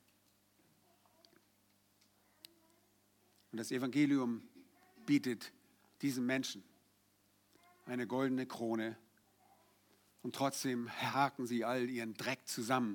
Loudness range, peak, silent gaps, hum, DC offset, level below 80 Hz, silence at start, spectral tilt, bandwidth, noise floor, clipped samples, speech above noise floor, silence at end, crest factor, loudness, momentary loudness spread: 5 LU; -18 dBFS; none; 50 Hz at -70 dBFS; under 0.1%; under -90 dBFS; 3.55 s; -4.5 dB/octave; 19 kHz; -74 dBFS; under 0.1%; 37 dB; 0 s; 22 dB; -38 LUFS; 12 LU